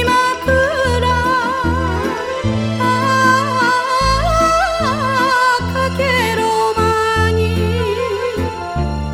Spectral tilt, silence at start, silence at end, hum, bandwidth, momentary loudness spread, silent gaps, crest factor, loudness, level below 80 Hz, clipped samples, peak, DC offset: -5 dB/octave; 0 s; 0 s; none; 16.5 kHz; 6 LU; none; 14 dB; -15 LUFS; -28 dBFS; under 0.1%; 0 dBFS; under 0.1%